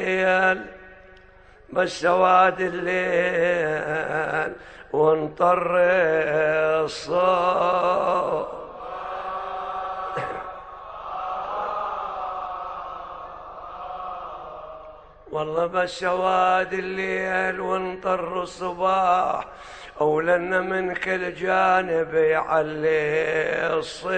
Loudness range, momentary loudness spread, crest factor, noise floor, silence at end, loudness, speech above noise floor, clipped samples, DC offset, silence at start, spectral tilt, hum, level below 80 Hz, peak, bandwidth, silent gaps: 10 LU; 16 LU; 18 dB; -50 dBFS; 0 s; -23 LUFS; 28 dB; under 0.1%; under 0.1%; 0 s; -5 dB/octave; none; -54 dBFS; -6 dBFS; 9.2 kHz; none